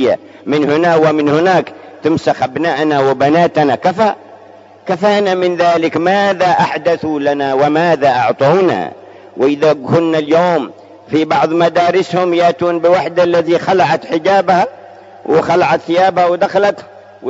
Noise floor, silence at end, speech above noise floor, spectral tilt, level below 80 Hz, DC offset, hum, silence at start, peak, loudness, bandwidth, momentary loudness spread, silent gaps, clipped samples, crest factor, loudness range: -39 dBFS; 0 s; 27 dB; -6 dB/octave; -58 dBFS; under 0.1%; none; 0 s; 0 dBFS; -13 LUFS; 7.8 kHz; 6 LU; none; under 0.1%; 12 dB; 1 LU